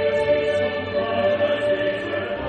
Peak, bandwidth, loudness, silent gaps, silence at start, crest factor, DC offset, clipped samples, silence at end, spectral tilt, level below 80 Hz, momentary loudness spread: -8 dBFS; 9 kHz; -22 LUFS; none; 0 s; 14 dB; under 0.1%; under 0.1%; 0 s; -6 dB/octave; -50 dBFS; 4 LU